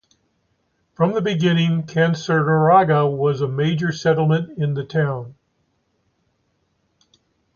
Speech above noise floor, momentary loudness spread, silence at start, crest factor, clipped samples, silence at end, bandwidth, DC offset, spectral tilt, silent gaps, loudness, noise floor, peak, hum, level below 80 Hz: 50 dB; 9 LU; 1 s; 18 dB; under 0.1%; 2.25 s; 7 kHz; under 0.1%; -7 dB/octave; none; -19 LUFS; -68 dBFS; -2 dBFS; none; -60 dBFS